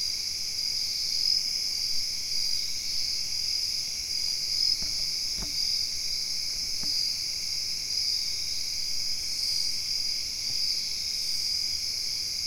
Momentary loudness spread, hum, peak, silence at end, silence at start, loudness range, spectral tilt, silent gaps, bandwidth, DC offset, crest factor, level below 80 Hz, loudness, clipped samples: 4 LU; none; -12 dBFS; 0 s; 0 s; 1 LU; 1.5 dB/octave; none; 16.5 kHz; 0.7%; 16 dB; -52 dBFS; -27 LUFS; under 0.1%